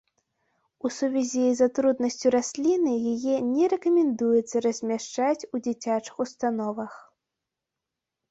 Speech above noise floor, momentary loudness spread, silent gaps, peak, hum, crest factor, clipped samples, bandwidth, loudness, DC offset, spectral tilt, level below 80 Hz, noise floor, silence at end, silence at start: 62 dB; 8 LU; none; -10 dBFS; none; 16 dB; under 0.1%; 8.2 kHz; -25 LUFS; under 0.1%; -4.5 dB/octave; -70 dBFS; -87 dBFS; 1.3 s; 0.85 s